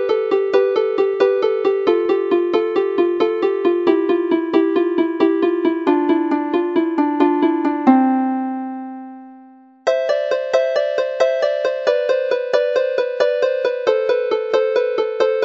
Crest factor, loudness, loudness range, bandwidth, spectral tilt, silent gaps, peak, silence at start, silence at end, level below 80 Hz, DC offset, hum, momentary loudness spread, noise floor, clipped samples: 16 dB; -18 LUFS; 2 LU; 7.4 kHz; -5 dB/octave; none; 0 dBFS; 0 s; 0 s; -72 dBFS; under 0.1%; none; 3 LU; -45 dBFS; under 0.1%